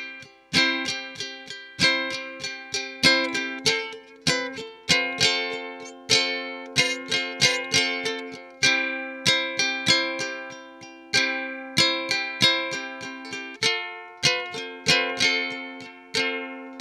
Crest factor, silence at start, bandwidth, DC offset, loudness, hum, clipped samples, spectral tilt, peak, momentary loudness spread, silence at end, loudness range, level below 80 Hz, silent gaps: 24 dB; 0 s; 16.5 kHz; under 0.1%; -23 LUFS; none; under 0.1%; -1.5 dB/octave; -2 dBFS; 15 LU; 0 s; 2 LU; -60 dBFS; none